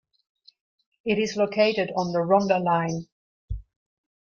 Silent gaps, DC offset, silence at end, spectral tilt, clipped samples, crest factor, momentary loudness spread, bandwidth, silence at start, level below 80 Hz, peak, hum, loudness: 3.12-3.48 s; under 0.1%; 0.6 s; -5.5 dB/octave; under 0.1%; 20 dB; 18 LU; 7.4 kHz; 1.05 s; -48 dBFS; -6 dBFS; none; -24 LUFS